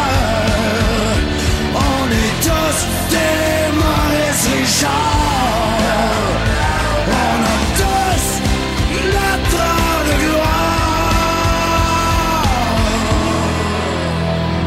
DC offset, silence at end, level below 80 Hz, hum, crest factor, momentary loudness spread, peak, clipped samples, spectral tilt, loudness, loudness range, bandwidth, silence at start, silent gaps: under 0.1%; 0 s; -22 dBFS; none; 14 dB; 3 LU; 0 dBFS; under 0.1%; -4 dB/octave; -15 LUFS; 1 LU; 16 kHz; 0 s; none